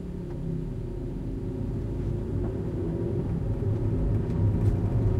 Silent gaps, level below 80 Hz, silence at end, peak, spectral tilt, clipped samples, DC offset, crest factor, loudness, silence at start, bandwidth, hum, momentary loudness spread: none; -34 dBFS; 0 s; -12 dBFS; -10.5 dB/octave; under 0.1%; under 0.1%; 14 dB; -30 LUFS; 0 s; 5 kHz; none; 9 LU